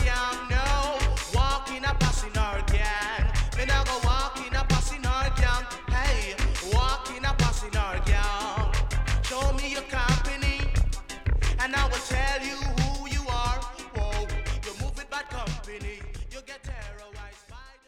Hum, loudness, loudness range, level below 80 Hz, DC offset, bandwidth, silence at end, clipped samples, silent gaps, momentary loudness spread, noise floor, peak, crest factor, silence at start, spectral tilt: none; -28 LUFS; 6 LU; -28 dBFS; under 0.1%; 14 kHz; 0.15 s; under 0.1%; none; 12 LU; -47 dBFS; -10 dBFS; 16 dB; 0 s; -4 dB/octave